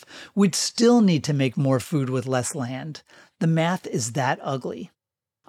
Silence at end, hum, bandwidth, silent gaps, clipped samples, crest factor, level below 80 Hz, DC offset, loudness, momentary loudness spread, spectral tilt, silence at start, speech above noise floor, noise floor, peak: 0.6 s; none; 15.5 kHz; none; under 0.1%; 16 dB; -72 dBFS; under 0.1%; -23 LUFS; 16 LU; -5.5 dB/octave; 0.1 s; 66 dB; -89 dBFS; -8 dBFS